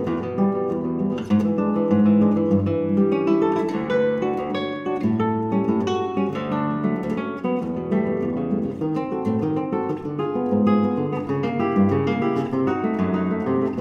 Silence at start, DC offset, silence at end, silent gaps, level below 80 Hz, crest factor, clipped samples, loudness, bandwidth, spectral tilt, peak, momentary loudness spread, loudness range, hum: 0 s; under 0.1%; 0 s; none; -56 dBFS; 14 dB; under 0.1%; -22 LUFS; 6.8 kHz; -9 dB/octave; -6 dBFS; 6 LU; 4 LU; none